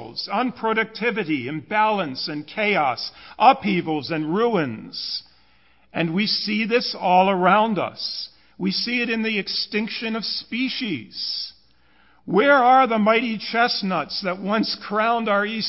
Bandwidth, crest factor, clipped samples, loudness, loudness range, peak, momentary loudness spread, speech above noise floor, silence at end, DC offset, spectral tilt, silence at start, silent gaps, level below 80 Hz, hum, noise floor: 5.8 kHz; 20 dB; under 0.1%; -21 LUFS; 5 LU; -2 dBFS; 11 LU; 38 dB; 0 s; 0.1%; -8 dB/octave; 0 s; none; -66 dBFS; none; -59 dBFS